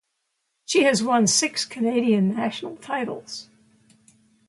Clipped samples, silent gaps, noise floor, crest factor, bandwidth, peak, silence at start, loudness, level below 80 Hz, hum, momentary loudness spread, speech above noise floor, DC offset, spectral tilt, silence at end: under 0.1%; none; -76 dBFS; 18 dB; 11.5 kHz; -6 dBFS; 0.7 s; -22 LUFS; -70 dBFS; none; 16 LU; 54 dB; under 0.1%; -3.5 dB/octave; 1.05 s